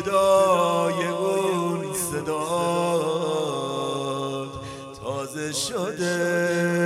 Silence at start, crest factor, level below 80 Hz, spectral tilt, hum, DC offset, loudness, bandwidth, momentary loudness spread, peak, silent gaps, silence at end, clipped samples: 0 s; 16 dB; -60 dBFS; -4.5 dB/octave; none; under 0.1%; -24 LUFS; 16 kHz; 11 LU; -8 dBFS; none; 0 s; under 0.1%